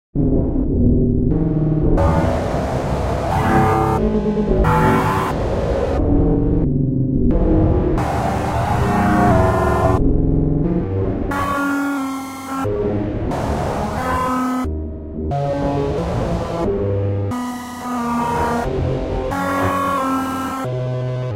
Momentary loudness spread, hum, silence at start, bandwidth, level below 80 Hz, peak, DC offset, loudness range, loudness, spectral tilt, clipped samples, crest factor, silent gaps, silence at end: 7 LU; none; 0.15 s; 16 kHz; -26 dBFS; -2 dBFS; under 0.1%; 4 LU; -19 LUFS; -7.5 dB/octave; under 0.1%; 16 dB; none; 0 s